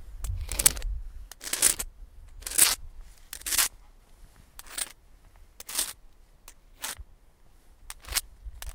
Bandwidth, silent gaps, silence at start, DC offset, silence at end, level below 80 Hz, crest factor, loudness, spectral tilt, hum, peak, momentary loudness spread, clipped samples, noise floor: 18 kHz; none; 0 s; under 0.1%; 0 s; -42 dBFS; 32 dB; -27 LUFS; 0 dB/octave; none; 0 dBFS; 22 LU; under 0.1%; -56 dBFS